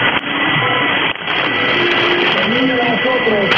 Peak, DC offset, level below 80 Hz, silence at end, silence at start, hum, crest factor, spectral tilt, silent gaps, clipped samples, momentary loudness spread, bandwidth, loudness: -2 dBFS; under 0.1%; -50 dBFS; 0 s; 0 s; none; 14 dB; -5.5 dB/octave; none; under 0.1%; 3 LU; 7.6 kHz; -13 LUFS